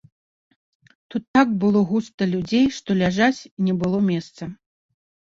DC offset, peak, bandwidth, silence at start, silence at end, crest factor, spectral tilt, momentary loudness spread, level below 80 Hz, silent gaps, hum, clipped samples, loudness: under 0.1%; -4 dBFS; 7.8 kHz; 1.15 s; 0.75 s; 18 dB; -6.5 dB/octave; 13 LU; -56 dBFS; 1.28-1.34 s, 2.14-2.18 s, 3.51-3.57 s; none; under 0.1%; -21 LUFS